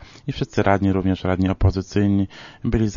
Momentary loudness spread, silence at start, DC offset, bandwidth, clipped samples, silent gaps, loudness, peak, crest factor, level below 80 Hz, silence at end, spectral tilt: 10 LU; 0.25 s; under 0.1%; 7.4 kHz; under 0.1%; none; -21 LUFS; -4 dBFS; 16 dB; -34 dBFS; 0 s; -7.5 dB/octave